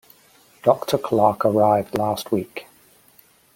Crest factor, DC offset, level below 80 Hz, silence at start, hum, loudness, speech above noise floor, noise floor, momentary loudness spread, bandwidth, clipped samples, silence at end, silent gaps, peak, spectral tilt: 20 dB; under 0.1%; -60 dBFS; 0.65 s; none; -20 LUFS; 35 dB; -55 dBFS; 8 LU; 17 kHz; under 0.1%; 0.95 s; none; -2 dBFS; -6.5 dB/octave